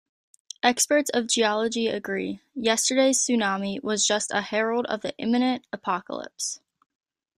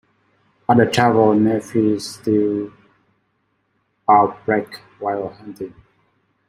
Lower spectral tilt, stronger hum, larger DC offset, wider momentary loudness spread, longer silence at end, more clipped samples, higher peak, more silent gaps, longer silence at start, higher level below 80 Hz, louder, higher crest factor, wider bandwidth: second, -2 dB/octave vs -6.5 dB/octave; neither; neither; second, 10 LU vs 19 LU; about the same, 0.8 s vs 0.8 s; neither; second, -6 dBFS vs -2 dBFS; neither; about the same, 0.65 s vs 0.7 s; second, -70 dBFS vs -58 dBFS; second, -24 LUFS vs -18 LUFS; about the same, 20 dB vs 18 dB; about the same, 15.5 kHz vs 16 kHz